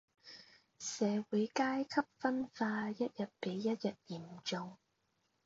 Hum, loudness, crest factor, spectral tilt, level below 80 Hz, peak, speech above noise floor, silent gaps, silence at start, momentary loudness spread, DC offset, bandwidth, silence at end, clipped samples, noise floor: none; -38 LUFS; 20 dB; -4.5 dB/octave; -82 dBFS; -20 dBFS; 43 dB; none; 0.25 s; 15 LU; under 0.1%; 7.6 kHz; 0.7 s; under 0.1%; -81 dBFS